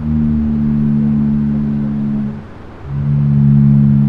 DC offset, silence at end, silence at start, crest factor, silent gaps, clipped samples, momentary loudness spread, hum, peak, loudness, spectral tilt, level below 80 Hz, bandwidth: under 0.1%; 0 s; 0 s; 12 dB; none; under 0.1%; 14 LU; none; -2 dBFS; -14 LUFS; -12 dB/octave; -30 dBFS; 3.2 kHz